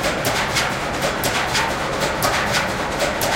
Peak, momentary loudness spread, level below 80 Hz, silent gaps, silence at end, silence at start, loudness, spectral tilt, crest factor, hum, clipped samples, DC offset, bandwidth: -4 dBFS; 3 LU; -38 dBFS; none; 0 s; 0 s; -20 LUFS; -3 dB/octave; 16 dB; none; under 0.1%; under 0.1%; 17 kHz